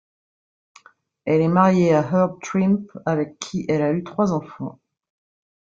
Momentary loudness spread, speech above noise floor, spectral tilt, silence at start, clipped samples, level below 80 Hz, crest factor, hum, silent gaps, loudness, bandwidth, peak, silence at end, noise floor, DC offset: 13 LU; 35 dB; -7.5 dB/octave; 1.25 s; under 0.1%; -60 dBFS; 20 dB; none; none; -20 LUFS; 7.6 kHz; -2 dBFS; 1 s; -54 dBFS; under 0.1%